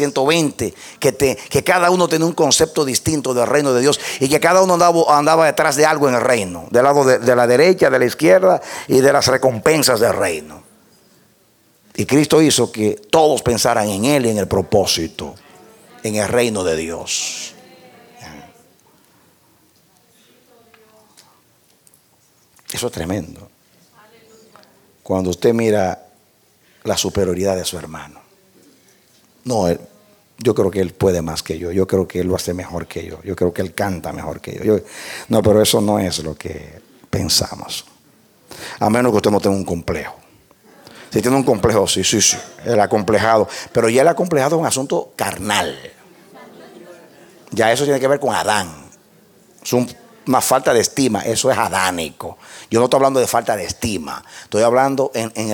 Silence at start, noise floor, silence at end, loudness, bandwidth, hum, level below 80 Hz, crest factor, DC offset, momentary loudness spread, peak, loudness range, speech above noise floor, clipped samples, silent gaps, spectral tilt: 0 s; -56 dBFS; 0 s; -16 LUFS; 19 kHz; none; -48 dBFS; 18 dB; under 0.1%; 15 LU; 0 dBFS; 10 LU; 40 dB; under 0.1%; none; -4 dB/octave